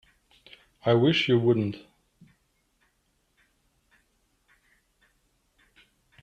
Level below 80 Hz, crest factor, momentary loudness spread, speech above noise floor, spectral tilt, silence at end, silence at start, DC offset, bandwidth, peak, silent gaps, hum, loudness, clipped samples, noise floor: -68 dBFS; 20 dB; 12 LU; 49 dB; -7 dB/octave; 4.45 s; 0.85 s; under 0.1%; 7.8 kHz; -10 dBFS; none; none; -24 LUFS; under 0.1%; -72 dBFS